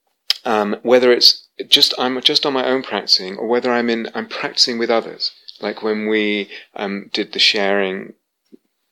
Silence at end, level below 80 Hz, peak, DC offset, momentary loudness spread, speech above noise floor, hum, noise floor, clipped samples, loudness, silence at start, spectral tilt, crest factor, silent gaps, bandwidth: 0.85 s; -72 dBFS; 0 dBFS; under 0.1%; 13 LU; 34 dB; none; -51 dBFS; under 0.1%; -16 LUFS; 0.3 s; -2.5 dB/octave; 18 dB; none; 16.5 kHz